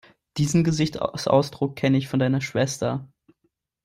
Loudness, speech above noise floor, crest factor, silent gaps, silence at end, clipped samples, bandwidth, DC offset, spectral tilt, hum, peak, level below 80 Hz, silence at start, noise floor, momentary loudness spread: -23 LUFS; 50 dB; 18 dB; none; 0.8 s; under 0.1%; 16 kHz; under 0.1%; -6 dB/octave; none; -6 dBFS; -54 dBFS; 0.35 s; -73 dBFS; 7 LU